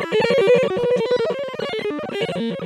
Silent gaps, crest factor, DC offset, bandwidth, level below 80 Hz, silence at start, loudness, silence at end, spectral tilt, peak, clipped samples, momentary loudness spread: none; 14 dB; under 0.1%; 11 kHz; -60 dBFS; 0 s; -20 LUFS; 0 s; -5.5 dB/octave; -6 dBFS; under 0.1%; 10 LU